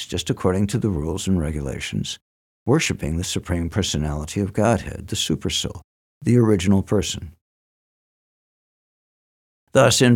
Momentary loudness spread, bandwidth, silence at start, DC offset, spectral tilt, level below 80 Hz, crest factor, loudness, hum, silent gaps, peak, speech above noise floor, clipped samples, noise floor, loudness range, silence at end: 11 LU; 17 kHz; 0 s; under 0.1%; -5 dB/octave; -40 dBFS; 18 dB; -22 LUFS; none; 2.21-2.66 s, 5.84-6.21 s, 7.41-9.67 s; -4 dBFS; over 70 dB; under 0.1%; under -90 dBFS; 3 LU; 0 s